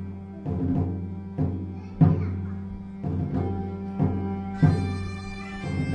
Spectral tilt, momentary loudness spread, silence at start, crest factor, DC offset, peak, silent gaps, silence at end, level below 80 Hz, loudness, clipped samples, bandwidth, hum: -9 dB/octave; 13 LU; 0 s; 20 dB; 0.1%; -6 dBFS; none; 0 s; -46 dBFS; -28 LUFS; under 0.1%; 8.8 kHz; none